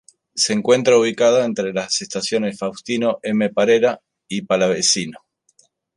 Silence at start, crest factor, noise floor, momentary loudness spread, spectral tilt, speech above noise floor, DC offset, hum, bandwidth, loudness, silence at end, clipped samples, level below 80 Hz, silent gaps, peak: 0.35 s; 16 dB; -59 dBFS; 13 LU; -3 dB/octave; 41 dB; under 0.1%; none; 11.5 kHz; -18 LUFS; 0.8 s; under 0.1%; -64 dBFS; none; -2 dBFS